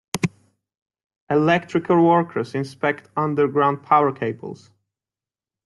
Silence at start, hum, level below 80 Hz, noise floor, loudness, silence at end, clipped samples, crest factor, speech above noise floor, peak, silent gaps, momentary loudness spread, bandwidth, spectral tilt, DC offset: 0.15 s; none; -64 dBFS; under -90 dBFS; -20 LUFS; 1.1 s; under 0.1%; 20 dB; over 70 dB; -2 dBFS; 0.82-0.86 s, 1.16-1.27 s; 10 LU; 12 kHz; -6.5 dB/octave; under 0.1%